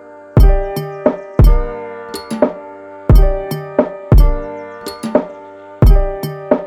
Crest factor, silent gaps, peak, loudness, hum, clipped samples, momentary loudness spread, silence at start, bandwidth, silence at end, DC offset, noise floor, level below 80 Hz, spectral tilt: 12 dB; none; 0 dBFS; -16 LUFS; none; under 0.1%; 15 LU; 0.35 s; 13 kHz; 0 s; under 0.1%; -34 dBFS; -14 dBFS; -8 dB/octave